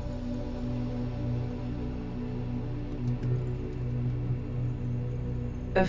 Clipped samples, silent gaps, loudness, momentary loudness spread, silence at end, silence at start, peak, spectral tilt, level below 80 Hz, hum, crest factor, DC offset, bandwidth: under 0.1%; none; -34 LUFS; 4 LU; 0 s; 0 s; -12 dBFS; -9 dB/octave; -40 dBFS; 60 Hz at -40 dBFS; 20 dB; under 0.1%; 7.2 kHz